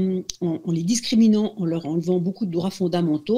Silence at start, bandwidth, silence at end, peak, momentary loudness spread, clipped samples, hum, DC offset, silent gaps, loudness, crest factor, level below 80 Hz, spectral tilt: 0 s; 13 kHz; 0 s; -4 dBFS; 8 LU; under 0.1%; none; under 0.1%; none; -22 LUFS; 16 dB; -60 dBFS; -6 dB/octave